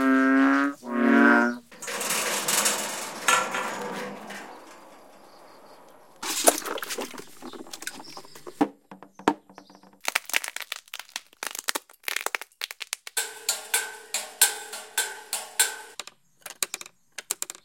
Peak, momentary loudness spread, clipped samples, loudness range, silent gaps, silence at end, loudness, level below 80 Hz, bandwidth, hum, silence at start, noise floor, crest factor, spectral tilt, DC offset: 0 dBFS; 19 LU; under 0.1%; 8 LU; none; 0.15 s; -26 LUFS; -76 dBFS; 17 kHz; none; 0 s; -52 dBFS; 28 dB; -1 dB/octave; under 0.1%